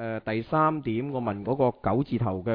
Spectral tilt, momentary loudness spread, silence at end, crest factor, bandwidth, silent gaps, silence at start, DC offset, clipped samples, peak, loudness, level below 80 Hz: -11 dB/octave; 6 LU; 0 s; 16 dB; 5.2 kHz; none; 0 s; under 0.1%; under 0.1%; -12 dBFS; -27 LUFS; -54 dBFS